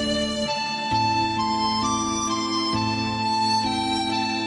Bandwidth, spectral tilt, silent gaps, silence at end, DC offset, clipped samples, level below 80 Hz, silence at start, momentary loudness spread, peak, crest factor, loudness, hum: 11.5 kHz; -3.5 dB/octave; none; 0 s; under 0.1%; under 0.1%; -48 dBFS; 0 s; 3 LU; -12 dBFS; 12 dB; -23 LUFS; none